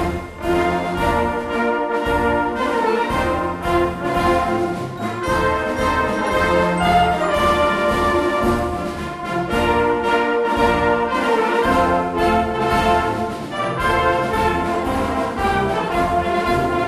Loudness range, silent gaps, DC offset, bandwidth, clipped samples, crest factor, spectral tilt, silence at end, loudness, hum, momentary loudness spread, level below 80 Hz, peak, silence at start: 2 LU; none; under 0.1%; 15.5 kHz; under 0.1%; 16 dB; -5.5 dB/octave; 0 s; -19 LUFS; none; 5 LU; -34 dBFS; -4 dBFS; 0 s